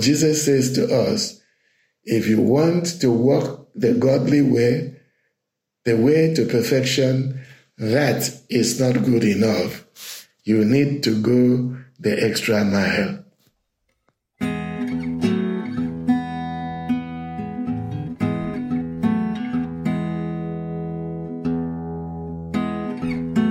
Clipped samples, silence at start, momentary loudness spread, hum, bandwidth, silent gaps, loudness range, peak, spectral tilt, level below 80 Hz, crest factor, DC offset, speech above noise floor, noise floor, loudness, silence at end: under 0.1%; 0 s; 12 LU; none; 16.5 kHz; none; 6 LU; -6 dBFS; -5.5 dB/octave; -52 dBFS; 16 dB; under 0.1%; 62 dB; -80 dBFS; -21 LUFS; 0 s